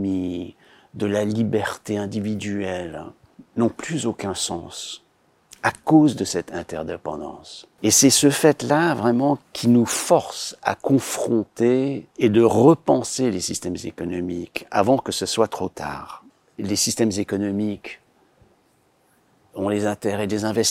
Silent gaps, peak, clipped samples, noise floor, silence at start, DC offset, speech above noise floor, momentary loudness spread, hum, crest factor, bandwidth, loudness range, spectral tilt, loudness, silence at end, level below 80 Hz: none; -2 dBFS; under 0.1%; -62 dBFS; 0 s; under 0.1%; 41 dB; 16 LU; none; 20 dB; 16.5 kHz; 8 LU; -4.5 dB/octave; -21 LUFS; 0 s; -60 dBFS